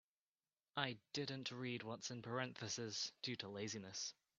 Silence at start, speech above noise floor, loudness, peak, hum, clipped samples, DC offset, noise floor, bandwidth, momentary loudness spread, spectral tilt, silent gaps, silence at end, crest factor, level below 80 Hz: 0.75 s; over 43 dB; -46 LUFS; -22 dBFS; none; under 0.1%; under 0.1%; under -90 dBFS; 8.4 kHz; 3 LU; -3 dB/octave; none; 0.25 s; 26 dB; -86 dBFS